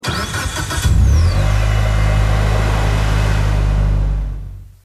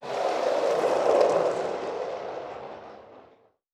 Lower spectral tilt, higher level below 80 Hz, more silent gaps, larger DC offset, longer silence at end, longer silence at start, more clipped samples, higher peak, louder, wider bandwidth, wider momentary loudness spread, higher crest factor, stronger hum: first, -5.5 dB/octave vs -4 dB/octave; first, -16 dBFS vs -70 dBFS; neither; neither; second, 0.2 s vs 0.5 s; about the same, 0.05 s vs 0 s; neither; first, -4 dBFS vs -8 dBFS; first, -16 LUFS vs -26 LUFS; about the same, 13.5 kHz vs 12.5 kHz; second, 7 LU vs 19 LU; second, 10 dB vs 20 dB; neither